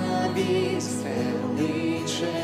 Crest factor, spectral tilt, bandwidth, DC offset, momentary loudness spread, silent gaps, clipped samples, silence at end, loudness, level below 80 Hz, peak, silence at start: 14 dB; -5 dB/octave; 15.5 kHz; under 0.1%; 3 LU; none; under 0.1%; 0 s; -26 LUFS; -62 dBFS; -12 dBFS; 0 s